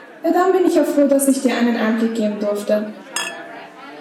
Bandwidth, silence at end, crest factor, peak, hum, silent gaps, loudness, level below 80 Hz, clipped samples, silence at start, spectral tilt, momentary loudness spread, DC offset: 16.5 kHz; 0 s; 14 dB; -4 dBFS; none; none; -18 LUFS; -68 dBFS; under 0.1%; 0 s; -4 dB/octave; 15 LU; under 0.1%